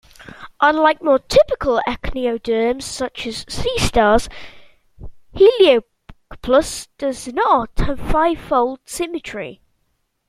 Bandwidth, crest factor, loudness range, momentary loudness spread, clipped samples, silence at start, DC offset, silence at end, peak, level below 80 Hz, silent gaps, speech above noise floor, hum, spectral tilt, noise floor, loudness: 15 kHz; 18 dB; 3 LU; 15 LU; under 0.1%; 0.2 s; under 0.1%; 0.75 s; -2 dBFS; -32 dBFS; none; 51 dB; none; -4.5 dB/octave; -68 dBFS; -18 LUFS